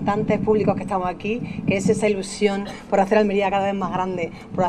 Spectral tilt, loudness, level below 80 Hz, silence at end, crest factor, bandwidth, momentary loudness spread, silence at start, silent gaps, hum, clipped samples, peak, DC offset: -6 dB/octave; -22 LUFS; -48 dBFS; 0 s; 16 dB; 11.5 kHz; 8 LU; 0 s; none; none; under 0.1%; -4 dBFS; under 0.1%